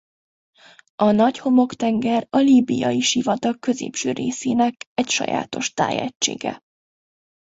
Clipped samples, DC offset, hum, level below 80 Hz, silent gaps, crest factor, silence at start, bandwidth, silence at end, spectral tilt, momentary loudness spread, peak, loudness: under 0.1%; under 0.1%; none; -62 dBFS; 4.86-4.96 s, 6.15-6.20 s; 16 dB; 1 s; 8 kHz; 1 s; -4 dB/octave; 8 LU; -4 dBFS; -20 LUFS